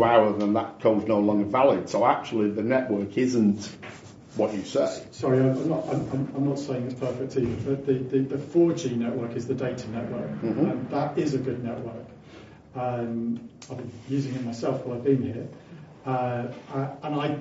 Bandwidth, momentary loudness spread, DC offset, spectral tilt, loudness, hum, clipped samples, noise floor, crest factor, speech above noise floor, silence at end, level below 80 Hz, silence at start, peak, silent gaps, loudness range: 8 kHz; 16 LU; under 0.1%; -7 dB/octave; -26 LUFS; none; under 0.1%; -47 dBFS; 20 dB; 22 dB; 0 s; -60 dBFS; 0 s; -6 dBFS; none; 7 LU